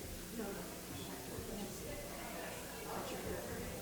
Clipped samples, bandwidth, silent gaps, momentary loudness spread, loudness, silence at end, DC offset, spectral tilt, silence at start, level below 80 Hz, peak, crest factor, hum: under 0.1%; over 20 kHz; none; 3 LU; -45 LUFS; 0 s; under 0.1%; -4 dB/octave; 0 s; -58 dBFS; -30 dBFS; 16 dB; none